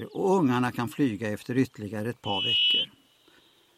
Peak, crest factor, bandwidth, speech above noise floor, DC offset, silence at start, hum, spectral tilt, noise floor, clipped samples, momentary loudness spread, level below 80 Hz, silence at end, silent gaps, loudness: -12 dBFS; 16 dB; 15.5 kHz; 34 dB; under 0.1%; 0 s; none; -5 dB/octave; -60 dBFS; under 0.1%; 12 LU; -68 dBFS; 0.9 s; none; -26 LUFS